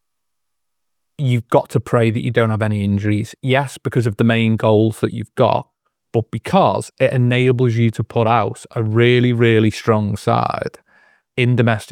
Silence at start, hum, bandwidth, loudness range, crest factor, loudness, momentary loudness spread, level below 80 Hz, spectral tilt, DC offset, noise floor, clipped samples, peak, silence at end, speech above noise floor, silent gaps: 1.2 s; none; 12.5 kHz; 3 LU; 16 dB; -17 LUFS; 9 LU; -56 dBFS; -7 dB/octave; under 0.1%; -79 dBFS; under 0.1%; 0 dBFS; 0 s; 63 dB; none